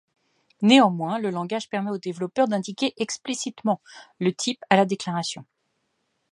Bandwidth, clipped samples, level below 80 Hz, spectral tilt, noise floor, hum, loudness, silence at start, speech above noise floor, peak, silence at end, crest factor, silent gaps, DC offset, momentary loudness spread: 11.5 kHz; under 0.1%; -74 dBFS; -4.5 dB/octave; -74 dBFS; none; -24 LUFS; 0.6 s; 50 dB; -2 dBFS; 0.9 s; 24 dB; none; under 0.1%; 12 LU